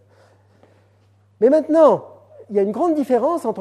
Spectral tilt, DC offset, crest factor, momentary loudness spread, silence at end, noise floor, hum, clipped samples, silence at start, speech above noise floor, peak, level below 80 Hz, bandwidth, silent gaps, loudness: -7.5 dB/octave; under 0.1%; 18 dB; 8 LU; 0 s; -56 dBFS; none; under 0.1%; 1.4 s; 40 dB; -2 dBFS; -76 dBFS; 13 kHz; none; -17 LUFS